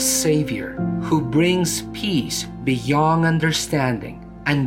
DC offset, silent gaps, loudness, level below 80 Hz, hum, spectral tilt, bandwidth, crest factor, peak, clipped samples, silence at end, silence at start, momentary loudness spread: under 0.1%; none; -20 LUFS; -44 dBFS; none; -4.5 dB/octave; 17 kHz; 16 dB; -4 dBFS; under 0.1%; 0 s; 0 s; 8 LU